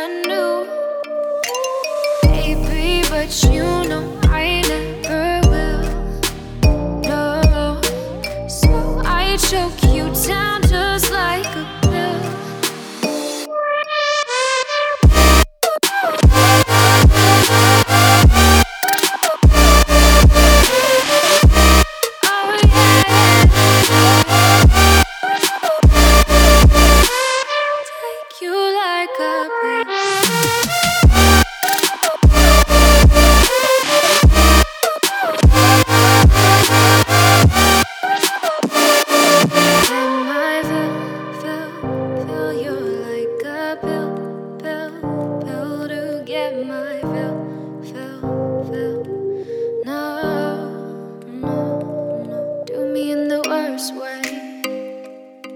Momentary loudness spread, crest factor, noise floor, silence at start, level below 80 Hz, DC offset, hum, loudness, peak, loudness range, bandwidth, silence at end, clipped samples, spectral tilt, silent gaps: 15 LU; 14 dB; -36 dBFS; 0 s; -18 dBFS; under 0.1%; none; -14 LUFS; 0 dBFS; 13 LU; over 20 kHz; 0 s; under 0.1%; -4 dB/octave; none